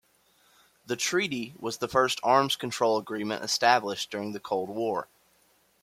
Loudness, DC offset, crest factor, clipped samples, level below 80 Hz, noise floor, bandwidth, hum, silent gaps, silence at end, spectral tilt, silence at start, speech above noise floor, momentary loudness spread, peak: -27 LUFS; under 0.1%; 22 dB; under 0.1%; -70 dBFS; -66 dBFS; 16.5 kHz; none; none; 0.8 s; -3 dB/octave; 0.9 s; 38 dB; 11 LU; -6 dBFS